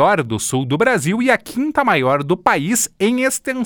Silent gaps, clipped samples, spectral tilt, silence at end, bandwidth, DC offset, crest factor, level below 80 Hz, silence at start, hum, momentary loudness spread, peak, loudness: none; under 0.1%; -4.5 dB/octave; 0 s; over 20 kHz; under 0.1%; 16 dB; -54 dBFS; 0 s; none; 4 LU; 0 dBFS; -17 LUFS